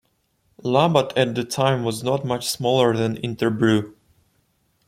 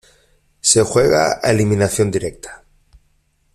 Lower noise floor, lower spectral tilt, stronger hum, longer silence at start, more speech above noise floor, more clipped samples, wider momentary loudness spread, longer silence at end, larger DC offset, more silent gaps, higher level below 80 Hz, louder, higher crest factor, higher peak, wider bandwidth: first, -67 dBFS vs -61 dBFS; first, -5.5 dB/octave vs -4 dB/octave; neither; about the same, 0.65 s vs 0.65 s; about the same, 47 dB vs 45 dB; neither; second, 6 LU vs 15 LU; about the same, 0.95 s vs 1 s; neither; neither; second, -60 dBFS vs -44 dBFS; second, -21 LUFS vs -15 LUFS; about the same, 20 dB vs 18 dB; about the same, -2 dBFS vs 0 dBFS; about the same, 16.5 kHz vs 15 kHz